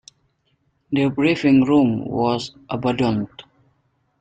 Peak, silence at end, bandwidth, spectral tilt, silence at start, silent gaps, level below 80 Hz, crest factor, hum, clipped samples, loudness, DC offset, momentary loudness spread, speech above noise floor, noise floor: -4 dBFS; 0.8 s; 8.6 kHz; -7 dB/octave; 0.9 s; none; -54 dBFS; 16 dB; none; under 0.1%; -19 LUFS; under 0.1%; 11 LU; 48 dB; -66 dBFS